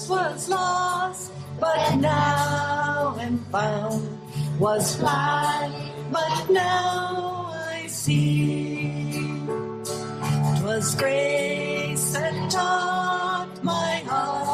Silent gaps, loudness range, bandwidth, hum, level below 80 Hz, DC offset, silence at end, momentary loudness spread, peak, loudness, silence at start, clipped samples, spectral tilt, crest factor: none; 2 LU; 14.5 kHz; none; -58 dBFS; under 0.1%; 0 s; 9 LU; -10 dBFS; -24 LUFS; 0 s; under 0.1%; -4.5 dB/octave; 14 dB